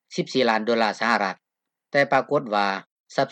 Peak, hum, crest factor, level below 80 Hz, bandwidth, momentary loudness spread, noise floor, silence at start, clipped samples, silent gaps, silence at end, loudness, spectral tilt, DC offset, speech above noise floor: -6 dBFS; none; 18 dB; -74 dBFS; 10 kHz; 9 LU; -85 dBFS; 0.1 s; under 0.1%; 2.91-3.04 s; 0 s; -23 LUFS; -4.5 dB/octave; under 0.1%; 63 dB